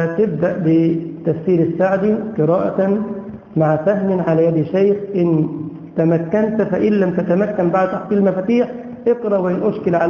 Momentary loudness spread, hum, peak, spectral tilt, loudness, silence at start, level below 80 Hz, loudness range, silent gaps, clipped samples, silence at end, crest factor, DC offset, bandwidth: 6 LU; none; -2 dBFS; -10 dB/octave; -17 LUFS; 0 s; -52 dBFS; 1 LU; none; under 0.1%; 0 s; 14 dB; under 0.1%; 6.8 kHz